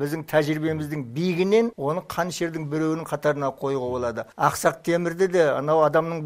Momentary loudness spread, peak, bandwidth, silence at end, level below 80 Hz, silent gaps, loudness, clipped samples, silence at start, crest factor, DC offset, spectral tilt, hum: 8 LU; -4 dBFS; 16 kHz; 0 s; -58 dBFS; none; -24 LUFS; under 0.1%; 0 s; 18 dB; under 0.1%; -6 dB/octave; none